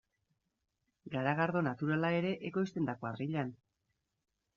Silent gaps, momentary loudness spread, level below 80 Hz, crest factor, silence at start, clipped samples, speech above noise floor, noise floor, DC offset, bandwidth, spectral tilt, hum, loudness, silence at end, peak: none; 7 LU; -76 dBFS; 20 dB; 1.05 s; under 0.1%; 49 dB; -84 dBFS; under 0.1%; 7.2 kHz; -6 dB/octave; none; -35 LUFS; 1 s; -16 dBFS